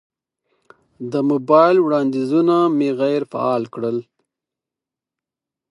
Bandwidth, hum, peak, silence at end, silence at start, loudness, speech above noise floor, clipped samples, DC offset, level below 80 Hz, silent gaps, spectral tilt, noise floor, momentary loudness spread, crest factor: 10.5 kHz; none; -2 dBFS; 1.7 s; 1 s; -18 LUFS; 70 dB; under 0.1%; under 0.1%; -74 dBFS; none; -8 dB/octave; -87 dBFS; 11 LU; 18 dB